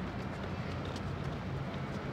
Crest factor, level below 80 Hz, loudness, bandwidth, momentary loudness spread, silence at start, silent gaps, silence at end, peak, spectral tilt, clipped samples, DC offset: 14 dB; -52 dBFS; -39 LUFS; 12 kHz; 1 LU; 0 s; none; 0 s; -26 dBFS; -7 dB/octave; under 0.1%; under 0.1%